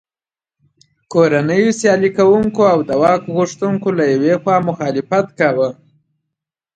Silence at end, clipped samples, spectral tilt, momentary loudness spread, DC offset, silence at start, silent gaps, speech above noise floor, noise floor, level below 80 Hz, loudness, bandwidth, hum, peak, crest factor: 1 s; under 0.1%; -6 dB/octave; 6 LU; under 0.1%; 1.1 s; none; over 76 dB; under -90 dBFS; -54 dBFS; -15 LUFS; 9.2 kHz; none; 0 dBFS; 16 dB